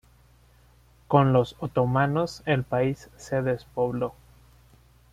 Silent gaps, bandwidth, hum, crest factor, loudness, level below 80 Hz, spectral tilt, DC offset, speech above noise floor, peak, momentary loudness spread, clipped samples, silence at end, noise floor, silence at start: none; 12 kHz; none; 22 dB; -25 LUFS; -54 dBFS; -7.5 dB/octave; under 0.1%; 33 dB; -4 dBFS; 9 LU; under 0.1%; 1 s; -57 dBFS; 1.1 s